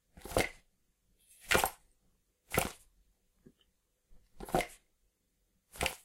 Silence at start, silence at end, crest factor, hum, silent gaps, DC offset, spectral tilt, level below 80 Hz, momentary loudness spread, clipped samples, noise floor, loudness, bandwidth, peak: 0.15 s; 0.1 s; 28 dB; none; none; under 0.1%; -3 dB/octave; -54 dBFS; 24 LU; under 0.1%; -77 dBFS; -35 LUFS; 16.5 kHz; -12 dBFS